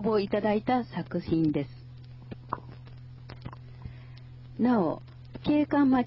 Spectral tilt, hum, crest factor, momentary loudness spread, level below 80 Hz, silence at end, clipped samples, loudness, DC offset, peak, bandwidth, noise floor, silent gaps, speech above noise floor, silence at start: -10.5 dB/octave; none; 16 dB; 22 LU; -54 dBFS; 0 s; under 0.1%; -28 LUFS; under 0.1%; -14 dBFS; 5.8 kHz; -46 dBFS; none; 20 dB; 0 s